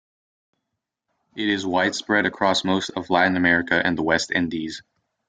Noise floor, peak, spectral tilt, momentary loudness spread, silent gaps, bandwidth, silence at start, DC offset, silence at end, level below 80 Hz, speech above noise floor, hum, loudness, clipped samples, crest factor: -81 dBFS; -4 dBFS; -4 dB/octave; 10 LU; none; 9.4 kHz; 1.35 s; under 0.1%; 0.5 s; -58 dBFS; 60 dB; none; -21 LUFS; under 0.1%; 20 dB